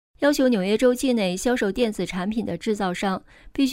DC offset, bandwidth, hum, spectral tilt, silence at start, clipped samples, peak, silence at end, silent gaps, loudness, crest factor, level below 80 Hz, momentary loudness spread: under 0.1%; 16 kHz; none; -5 dB/octave; 0.2 s; under 0.1%; -6 dBFS; 0 s; none; -23 LUFS; 16 dB; -48 dBFS; 7 LU